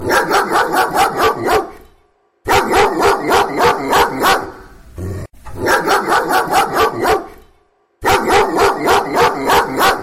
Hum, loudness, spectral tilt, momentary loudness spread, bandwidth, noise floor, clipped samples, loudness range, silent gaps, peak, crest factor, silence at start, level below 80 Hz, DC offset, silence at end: none; -14 LUFS; -3.5 dB/octave; 12 LU; 16.5 kHz; -56 dBFS; under 0.1%; 2 LU; none; -2 dBFS; 12 dB; 0 s; -38 dBFS; 0.1%; 0 s